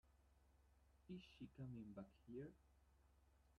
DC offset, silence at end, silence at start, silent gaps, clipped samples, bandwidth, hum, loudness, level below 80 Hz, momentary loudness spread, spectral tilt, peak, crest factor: under 0.1%; 0 s; 0.05 s; none; under 0.1%; 8.8 kHz; none; -59 LUFS; -76 dBFS; 5 LU; -8 dB/octave; -44 dBFS; 16 dB